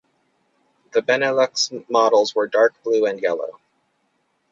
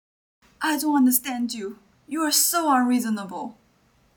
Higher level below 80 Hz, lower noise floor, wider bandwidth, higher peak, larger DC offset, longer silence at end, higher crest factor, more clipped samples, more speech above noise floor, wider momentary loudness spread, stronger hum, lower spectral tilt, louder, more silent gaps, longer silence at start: about the same, -74 dBFS vs -70 dBFS; first, -68 dBFS vs -62 dBFS; second, 7.8 kHz vs 19 kHz; first, -2 dBFS vs -6 dBFS; neither; first, 1 s vs 0.65 s; about the same, 18 dB vs 18 dB; neither; first, 49 dB vs 39 dB; second, 7 LU vs 16 LU; neither; about the same, -2.5 dB/octave vs -2 dB/octave; first, -19 LUFS vs -22 LUFS; neither; first, 0.95 s vs 0.6 s